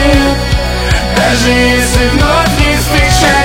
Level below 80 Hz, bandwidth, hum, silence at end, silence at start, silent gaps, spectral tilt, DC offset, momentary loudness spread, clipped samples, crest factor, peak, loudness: -16 dBFS; 18 kHz; none; 0 s; 0 s; none; -4 dB/octave; under 0.1%; 5 LU; 0.3%; 8 dB; 0 dBFS; -9 LUFS